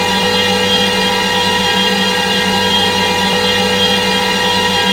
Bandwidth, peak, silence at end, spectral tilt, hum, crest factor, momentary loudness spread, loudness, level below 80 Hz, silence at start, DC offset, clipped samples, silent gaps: 16.5 kHz; 0 dBFS; 0 s; -3 dB/octave; none; 12 dB; 1 LU; -11 LUFS; -42 dBFS; 0 s; under 0.1%; under 0.1%; none